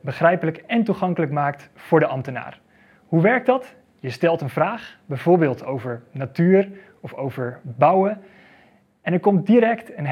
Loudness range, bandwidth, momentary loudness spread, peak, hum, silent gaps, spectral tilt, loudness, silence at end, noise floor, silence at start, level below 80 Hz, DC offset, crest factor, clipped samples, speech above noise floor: 1 LU; 12.5 kHz; 15 LU; 0 dBFS; none; none; -9 dB/octave; -21 LUFS; 0 s; -55 dBFS; 0.05 s; -68 dBFS; under 0.1%; 20 dB; under 0.1%; 35 dB